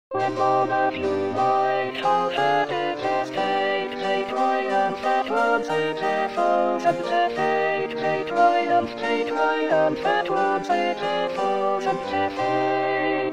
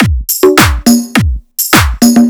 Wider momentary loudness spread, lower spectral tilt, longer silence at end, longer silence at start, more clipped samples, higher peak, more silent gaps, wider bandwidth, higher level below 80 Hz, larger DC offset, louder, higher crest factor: about the same, 4 LU vs 6 LU; about the same, -5 dB/octave vs -4.5 dB/octave; about the same, 0 s vs 0 s; about the same, 0.1 s vs 0 s; second, under 0.1% vs 3%; second, -6 dBFS vs 0 dBFS; neither; second, 11.5 kHz vs over 20 kHz; second, -64 dBFS vs -18 dBFS; first, 0.3% vs under 0.1%; second, -23 LUFS vs -9 LUFS; first, 16 dB vs 8 dB